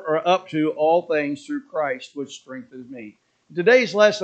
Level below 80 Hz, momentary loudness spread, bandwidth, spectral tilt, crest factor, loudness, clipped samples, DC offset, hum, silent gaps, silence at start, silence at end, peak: -78 dBFS; 21 LU; 8.6 kHz; -4.5 dB/octave; 20 dB; -21 LUFS; under 0.1%; under 0.1%; none; none; 0 s; 0 s; 0 dBFS